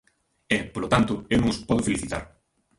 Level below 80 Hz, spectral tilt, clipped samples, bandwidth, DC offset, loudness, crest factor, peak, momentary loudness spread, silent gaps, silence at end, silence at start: -44 dBFS; -5 dB/octave; under 0.1%; 11.5 kHz; under 0.1%; -25 LUFS; 22 dB; -4 dBFS; 7 LU; none; 0.5 s; 0.5 s